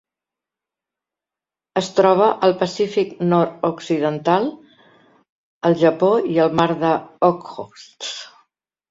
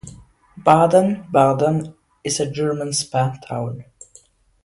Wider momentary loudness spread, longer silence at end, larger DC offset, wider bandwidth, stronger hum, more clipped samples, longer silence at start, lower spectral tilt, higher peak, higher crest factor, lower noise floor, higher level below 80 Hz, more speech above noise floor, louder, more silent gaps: about the same, 14 LU vs 15 LU; second, 0.65 s vs 0.8 s; neither; second, 7.8 kHz vs 11.5 kHz; neither; neither; first, 1.75 s vs 0.05 s; about the same, -6 dB/octave vs -5.5 dB/octave; about the same, -2 dBFS vs 0 dBFS; about the same, 18 dB vs 20 dB; first, -89 dBFS vs -52 dBFS; second, -64 dBFS vs -54 dBFS; first, 71 dB vs 34 dB; about the same, -19 LUFS vs -19 LUFS; first, 5.30-5.61 s vs none